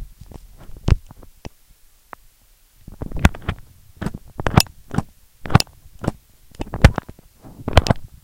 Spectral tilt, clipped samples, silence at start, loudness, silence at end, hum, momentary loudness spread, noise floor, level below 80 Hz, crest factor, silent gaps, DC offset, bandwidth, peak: -5.5 dB/octave; 0.2%; 0 s; -21 LUFS; 0.2 s; none; 25 LU; -54 dBFS; -28 dBFS; 22 dB; none; under 0.1%; 17 kHz; 0 dBFS